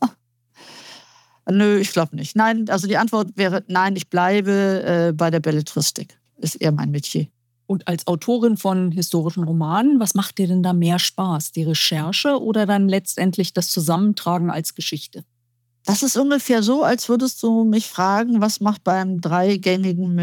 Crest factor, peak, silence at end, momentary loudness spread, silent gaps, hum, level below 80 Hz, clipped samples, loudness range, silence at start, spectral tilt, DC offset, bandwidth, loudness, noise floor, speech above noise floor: 16 dB; -4 dBFS; 0 s; 7 LU; none; none; -74 dBFS; under 0.1%; 3 LU; 0 s; -5 dB/octave; under 0.1%; 19 kHz; -19 LUFS; -69 dBFS; 50 dB